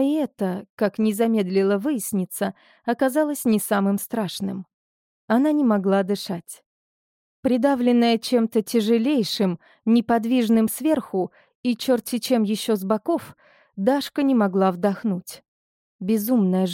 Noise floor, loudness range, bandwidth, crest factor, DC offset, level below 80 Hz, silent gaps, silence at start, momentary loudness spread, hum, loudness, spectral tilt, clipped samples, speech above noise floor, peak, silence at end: under -90 dBFS; 3 LU; 17 kHz; 16 dB; under 0.1%; -68 dBFS; 0.70-0.77 s, 4.74-5.28 s, 6.66-7.43 s, 11.55-11.63 s, 15.48-15.99 s; 0 s; 10 LU; none; -22 LUFS; -5.5 dB/octave; under 0.1%; over 69 dB; -6 dBFS; 0 s